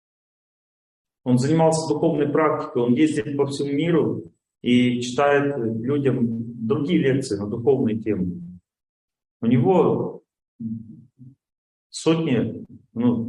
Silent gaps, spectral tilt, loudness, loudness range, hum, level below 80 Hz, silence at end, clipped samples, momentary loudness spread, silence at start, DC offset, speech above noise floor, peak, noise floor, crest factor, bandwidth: 8.89-9.08 s, 9.31-9.40 s, 10.48-10.59 s, 11.58-11.90 s; -6.5 dB/octave; -22 LUFS; 4 LU; none; -62 dBFS; 0 s; under 0.1%; 14 LU; 1.25 s; under 0.1%; 28 dB; -6 dBFS; -49 dBFS; 16 dB; 11 kHz